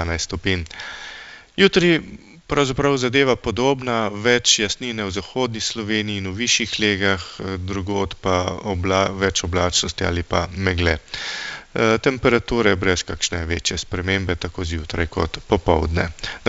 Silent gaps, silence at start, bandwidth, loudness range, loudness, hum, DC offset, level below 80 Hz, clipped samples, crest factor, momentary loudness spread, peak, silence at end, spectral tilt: none; 0 s; 8 kHz; 3 LU; -20 LUFS; none; under 0.1%; -36 dBFS; under 0.1%; 20 dB; 9 LU; -2 dBFS; 0 s; -4 dB/octave